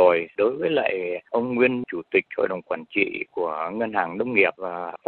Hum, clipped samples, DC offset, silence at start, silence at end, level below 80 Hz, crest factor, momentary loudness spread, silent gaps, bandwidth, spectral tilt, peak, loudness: none; under 0.1%; under 0.1%; 0 s; 0.1 s; -68 dBFS; 20 dB; 8 LU; none; 4.4 kHz; -9 dB/octave; -4 dBFS; -24 LUFS